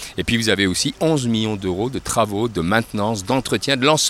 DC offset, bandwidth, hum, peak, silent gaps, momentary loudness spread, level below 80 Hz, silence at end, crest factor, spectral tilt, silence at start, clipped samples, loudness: under 0.1%; 16.5 kHz; none; 0 dBFS; none; 6 LU; -44 dBFS; 0 s; 20 dB; -4 dB/octave; 0 s; under 0.1%; -20 LUFS